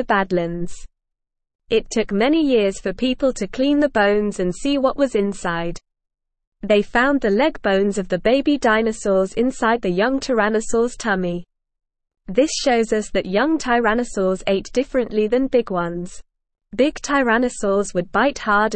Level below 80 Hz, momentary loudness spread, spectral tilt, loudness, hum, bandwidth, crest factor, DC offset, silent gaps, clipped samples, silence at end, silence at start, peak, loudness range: -42 dBFS; 7 LU; -5 dB/octave; -19 LUFS; none; 8.8 kHz; 16 dB; 0.3%; 1.55-1.59 s, 6.47-6.52 s; under 0.1%; 0 s; 0 s; -4 dBFS; 3 LU